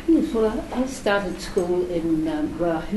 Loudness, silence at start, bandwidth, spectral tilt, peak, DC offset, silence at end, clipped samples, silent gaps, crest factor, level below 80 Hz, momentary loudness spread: -24 LUFS; 0 s; 12.5 kHz; -6 dB/octave; -8 dBFS; under 0.1%; 0 s; under 0.1%; none; 14 dB; -40 dBFS; 5 LU